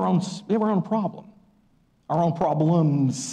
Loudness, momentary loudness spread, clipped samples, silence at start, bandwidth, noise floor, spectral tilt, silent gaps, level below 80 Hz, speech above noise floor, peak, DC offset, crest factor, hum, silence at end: -23 LUFS; 6 LU; under 0.1%; 0 s; 10 kHz; -62 dBFS; -7 dB/octave; none; -64 dBFS; 40 dB; -12 dBFS; under 0.1%; 12 dB; none; 0 s